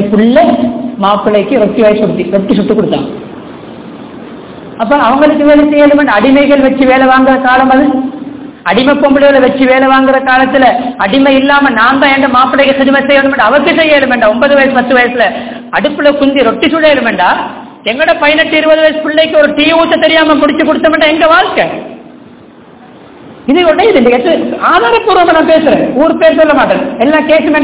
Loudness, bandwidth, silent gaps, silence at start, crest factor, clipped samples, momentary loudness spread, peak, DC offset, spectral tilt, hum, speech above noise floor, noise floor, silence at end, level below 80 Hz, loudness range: -7 LUFS; 4 kHz; none; 0 s; 8 dB; 6%; 10 LU; 0 dBFS; 0.5%; -8.5 dB/octave; none; 28 dB; -34 dBFS; 0 s; -40 dBFS; 4 LU